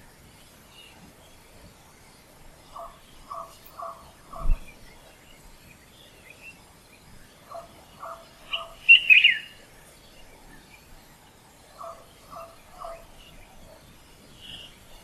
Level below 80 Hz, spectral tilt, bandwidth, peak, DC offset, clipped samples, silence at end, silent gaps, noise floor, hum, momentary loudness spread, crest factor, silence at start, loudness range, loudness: -40 dBFS; -1.5 dB/octave; 15.5 kHz; -4 dBFS; under 0.1%; under 0.1%; 0.5 s; none; -53 dBFS; none; 31 LU; 26 dB; 2.75 s; 25 LU; -18 LUFS